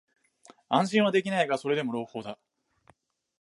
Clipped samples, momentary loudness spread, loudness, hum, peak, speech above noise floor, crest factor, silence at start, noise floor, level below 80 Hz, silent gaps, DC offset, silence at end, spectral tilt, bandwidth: under 0.1%; 16 LU; -27 LUFS; none; -10 dBFS; 38 dB; 20 dB; 0.7 s; -65 dBFS; -76 dBFS; none; under 0.1%; 1.05 s; -5.5 dB/octave; 11.5 kHz